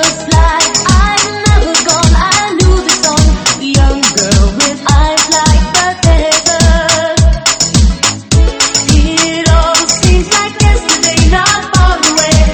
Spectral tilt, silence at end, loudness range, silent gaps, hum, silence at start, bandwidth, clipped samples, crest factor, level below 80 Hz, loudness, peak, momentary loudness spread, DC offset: -3.5 dB/octave; 0 s; 1 LU; none; none; 0 s; 15.5 kHz; 0.6%; 8 dB; -12 dBFS; -9 LUFS; 0 dBFS; 2 LU; under 0.1%